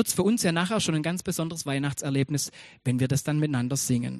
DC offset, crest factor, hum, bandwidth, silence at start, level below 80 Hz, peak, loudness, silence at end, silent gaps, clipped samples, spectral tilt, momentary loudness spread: under 0.1%; 18 dB; none; 15 kHz; 0 s; -58 dBFS; -8 dBFS; -27 LUFS; 0 s; none; under 0.1%; -5 dB/octave; 6 LU